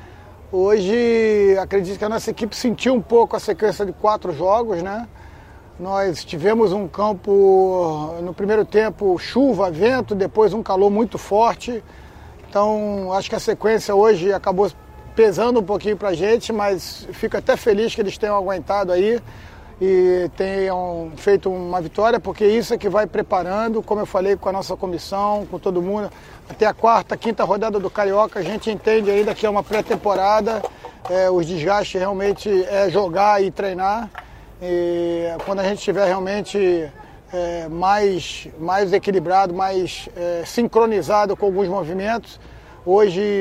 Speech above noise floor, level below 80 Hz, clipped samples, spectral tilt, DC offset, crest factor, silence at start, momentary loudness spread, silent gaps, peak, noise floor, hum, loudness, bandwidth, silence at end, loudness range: 23 dB; -46 dBFS; under 0.1%; -5.5 dB/octave; under 0.1%; 18 dB; 0 s; 9 LU; none; 0 dBFS; -42 dBFS; none; -19 LUFS; 15.5 kHz; 0 s; 3 LU